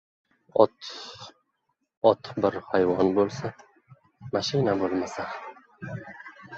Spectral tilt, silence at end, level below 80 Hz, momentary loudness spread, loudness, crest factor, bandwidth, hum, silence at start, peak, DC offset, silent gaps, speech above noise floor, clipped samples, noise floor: -6 dB/octave; 0 s; -62 dBFS; 20 LU; -26 LUFS; 24 dB; 8 kHz; none; 0.55 s; -4 dBFS; under 0.1%; 1.97-2.01 s; 51 dB; under 0.1%; -77 dBFS